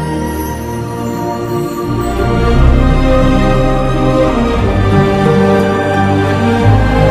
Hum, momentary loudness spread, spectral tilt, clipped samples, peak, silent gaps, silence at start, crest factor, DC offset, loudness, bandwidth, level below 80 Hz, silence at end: none; 8 LU; -7 dB/octave; 0.5%; 0 dBFS; none; 0 s; 10 dB; under 0.1%; -12 LUFS; 15.5 kHz; -18 dBFS; 0 s